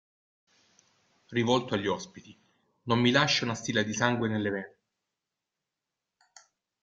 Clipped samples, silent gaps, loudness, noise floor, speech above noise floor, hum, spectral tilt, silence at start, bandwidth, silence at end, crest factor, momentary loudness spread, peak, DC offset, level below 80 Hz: under 0.1%; none; -28 LUFS; -88 dBFS; 60 dB; none; -4.5 dB/octave; 1.3 s; 7.8 kHz; 2.15 s; 24 dB; 13 LU; -8 dBFS; under 0.1%; -68 dBFS